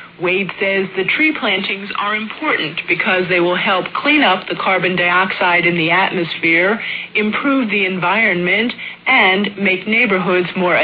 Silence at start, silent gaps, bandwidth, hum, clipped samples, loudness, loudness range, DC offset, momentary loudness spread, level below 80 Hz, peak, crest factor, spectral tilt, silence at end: 0 s; none; 5 kHz; none; under 0.1%; -15 LUFS; 2 LU; under 0.1%; 6 LU; -60 dBFS; -2 dBFS; 14 dB; -8 dB/octave; 0 s